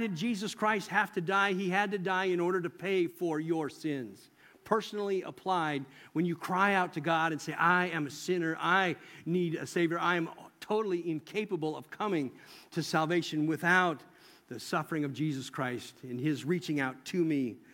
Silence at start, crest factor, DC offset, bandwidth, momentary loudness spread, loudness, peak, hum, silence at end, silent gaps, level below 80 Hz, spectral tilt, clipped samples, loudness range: 0 s; 20 dB; under 0.1%; 17 kHz; 9 LU; -32 LUFS; -12 dBFS; none; 0.15 s; none; -80 dBFS; -5.5 dB/octave; under 0.1%; 4 LU